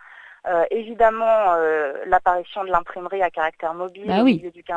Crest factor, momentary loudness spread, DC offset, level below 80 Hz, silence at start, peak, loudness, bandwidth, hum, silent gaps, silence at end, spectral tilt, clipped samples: 18 dB; 10 LU; under 0.1%; -50 dBFS; 0.1 s; -2 dBFS; -21 LUFS; 7.8 kHz; none; none; 0 s; -7 dB/octave; under 0.1%